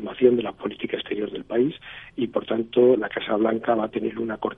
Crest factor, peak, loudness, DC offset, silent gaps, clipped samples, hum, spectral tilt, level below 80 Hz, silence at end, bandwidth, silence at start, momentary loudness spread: 20 dB; -4 dBFS; -24 LUFS; under 0.1%; none; under 0.1%; none; -9 dB/octave; -58 dBFS; 0.05 s; 3.9 kHz; 0 s; 11 LU